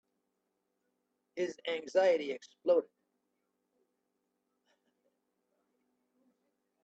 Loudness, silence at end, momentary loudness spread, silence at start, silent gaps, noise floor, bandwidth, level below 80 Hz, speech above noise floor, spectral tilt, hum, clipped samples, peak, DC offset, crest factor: -33 LUFS; 4 s; 11 LU; 1.35 s; none; -83 dBFS; 8 kHz; -90 dBFS; 51 dB; -4 dB/octave; none; under 0.1%; -16 dBFS; under 0.1%; 22 dB